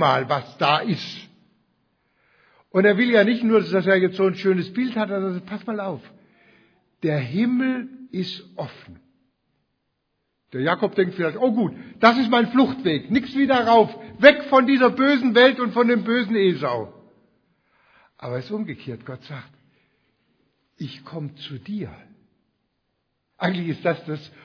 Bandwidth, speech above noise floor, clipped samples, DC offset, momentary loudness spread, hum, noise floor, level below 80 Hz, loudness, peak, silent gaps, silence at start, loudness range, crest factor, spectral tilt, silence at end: 5.4 kHz; 54 dB; under 0.1%; under 0.1%; 19 LU; none; -75 dBFS; -66 dBFS; -20 LUFS; 0 dBFS; none; 0 s; 18 LU; 22 dB; -7 dB/octave; 0.2 s